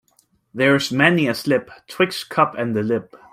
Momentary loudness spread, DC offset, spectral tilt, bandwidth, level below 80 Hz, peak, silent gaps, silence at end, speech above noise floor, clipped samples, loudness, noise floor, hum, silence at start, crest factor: 9 LU; under 0.1%; -5.5 dB/octave; 16 kHz; -62 dBFS; 0 dBFS; none; 0.15 s; 42 dB; under 0.1%; -19 LUFS; -62 dBFS; none; 0.55 s; 20 dB